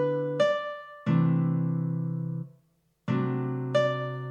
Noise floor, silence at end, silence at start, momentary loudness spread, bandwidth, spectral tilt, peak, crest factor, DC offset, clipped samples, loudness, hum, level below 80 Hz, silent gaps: -68 dBFS; 0 s; 0 s; 11 LU; 7.6 kHz; -8 dB/octave; -12 dBFS; 16 dB; under 0.1%; under 0.1%; -28 LUFS; none; -80 dBFS; none